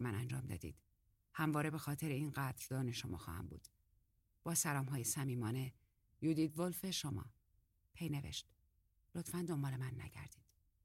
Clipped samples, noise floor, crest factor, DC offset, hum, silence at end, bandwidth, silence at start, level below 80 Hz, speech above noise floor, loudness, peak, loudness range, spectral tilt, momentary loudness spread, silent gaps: under 0.1%; -78 dBFS; 20 dB; under 0.1%; none; 0.5 s; 16.5 kHz; 0 s; -66 dBFS; 36 dB; -42 LUFS; -24 dBFS; 6 LU; -4.5 dB/octave; 13 LU; none